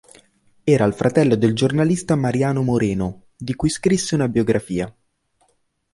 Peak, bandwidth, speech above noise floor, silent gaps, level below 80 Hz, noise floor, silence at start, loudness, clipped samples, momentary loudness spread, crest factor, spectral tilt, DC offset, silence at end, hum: -2 dBFS; 11.5 kHz; 47 dB; none; -46 dBFS; -65 dBFS; 0.65 s; -19 LUFS; under 0.1%; 10 LU; 16 dB; -6 dB/octave; under 0.1%; 1.05 s; none